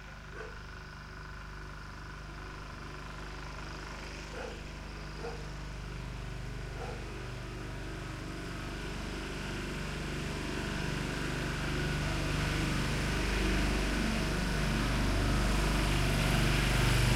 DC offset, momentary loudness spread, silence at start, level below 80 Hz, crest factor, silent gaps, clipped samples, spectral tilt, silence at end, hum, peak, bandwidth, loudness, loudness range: under 0.1%; 15 LU; 0 s; -38 dBFS; 18 dB; none; under 0.1%; -5 dB/octave; 0 s; 50 Hz at -45 dBFS; -16 dBFS; 15.5 kHz; -35 LUFS; 13 LU